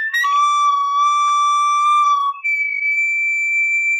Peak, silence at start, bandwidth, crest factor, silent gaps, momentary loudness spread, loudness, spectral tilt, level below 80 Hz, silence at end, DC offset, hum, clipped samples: -10 dBFS; 0 s; 12 kHz; 8 dB; none; 3 LU; -15 LUFS; 8 dB/octave; under -90 dBFS; 0 s; under 0.1%; none; under 0.1%